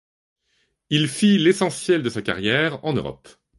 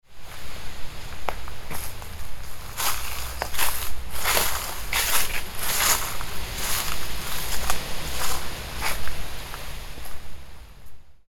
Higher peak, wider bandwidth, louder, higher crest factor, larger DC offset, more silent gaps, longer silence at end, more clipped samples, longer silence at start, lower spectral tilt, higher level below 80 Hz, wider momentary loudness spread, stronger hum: about the same, -4 dBFS vs -4 dBFS; second, 11.5 kHz vs 19 kHz; first, -20 LUFS vs -27 LUFS; about the same, 18 dB vs 18 dB; neither; neither; first, 0.45 s vs 0.1 s; neither; first, 0.9 s vs 0.1 s; first, -5 dB/octave vs -1 dB/octave; second, -56 dBFS vs -36 dBFS; second, 9 LU vs 17 LU; neither